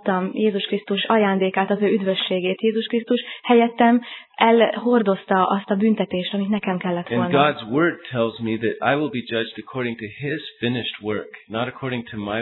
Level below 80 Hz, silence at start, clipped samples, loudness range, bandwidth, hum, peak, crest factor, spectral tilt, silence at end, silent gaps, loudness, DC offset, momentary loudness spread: -64 dBFS; 0.05 s; under 0.1%; 6 LU; 4.2 kHz; none; 0 dBFS; 20 dB; -9.5 dB/octave; 0 s; none; -21 LUFS; under 0.1%; 10 LU